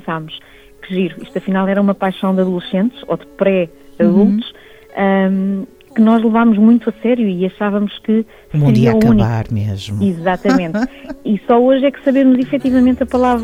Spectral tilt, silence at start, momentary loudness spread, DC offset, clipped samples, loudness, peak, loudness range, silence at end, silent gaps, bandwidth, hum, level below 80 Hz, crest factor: -8.5 dB/octave; 0.05 s; 12 LU; under 0.1%; under 0.1%; -15 LUFS; -2 dBFS; 3 LU; 0 s; none; 11 kHz; none; -40 dBFS; 12 dB